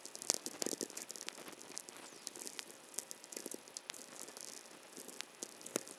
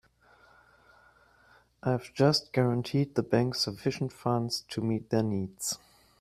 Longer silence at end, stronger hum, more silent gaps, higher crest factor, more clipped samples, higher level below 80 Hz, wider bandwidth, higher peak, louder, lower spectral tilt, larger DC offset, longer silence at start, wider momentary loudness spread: second, 0 s vs 0.45 s; neither; neither; first, 42 dB vs 20 dB; neither; second, under -90 dBFS vs -64 dBFS; about the same, 16 kHz vs 15.5 kHz; first, -6 dBFS vs -10 dBFS; second, -45 LUFS vs -30 LUFS; second, -0.5 dB/octave vs -5.5 dB/octave; neither; second, 0 s vs 1.85 s; first, 13 LU vs 8 LU